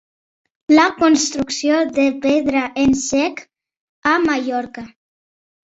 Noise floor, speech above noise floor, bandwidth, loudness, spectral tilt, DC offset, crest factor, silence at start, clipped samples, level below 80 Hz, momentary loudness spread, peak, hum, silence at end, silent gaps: under -90 dBFS; over 74 dB; 8 kHz; -17 LUFS; -3 dB/octave; under 0.1%; 16 dB; 0.7 s; under 0.1%; -50 dBFS; 11 LU; -2 dBFS; none; 0.9 s; 3.77-4.02 s